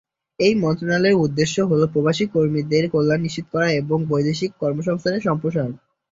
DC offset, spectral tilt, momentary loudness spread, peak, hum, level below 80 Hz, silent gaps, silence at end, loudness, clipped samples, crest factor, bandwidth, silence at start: under 0.1%; -6 dB/octave; 6 LU; -4 dBFS; none; -54 dBFS; none; 0.35 s; -20 LUFS; under 0.1%; 16 dB; 7.8 kHz; 0.4 s